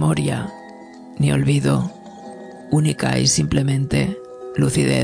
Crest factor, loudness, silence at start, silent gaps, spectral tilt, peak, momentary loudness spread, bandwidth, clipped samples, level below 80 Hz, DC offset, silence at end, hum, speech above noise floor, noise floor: 16 dB; -19 LUFS; 0 s; none; -5 dB/octave; -4 dBFS; 21 LU; 11 kHz; under 0.1%; -42 dBFS; under 0.1%; 0 s; none; 21 dB; -39 dBFS